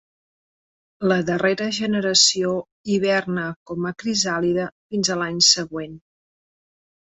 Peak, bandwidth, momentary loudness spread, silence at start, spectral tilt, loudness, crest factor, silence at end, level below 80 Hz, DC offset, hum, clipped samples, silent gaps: -2 dBFS; 8.2 kHz; 13 LU; 1 s; -3 dB/octave; -20 LUFS; 20 dB; 1.2 s; -60 dBFS; under 0.1%; none; under 0.1%; 2.72-2.84 s, 3.56-3.66 s, 4.72-4.90 s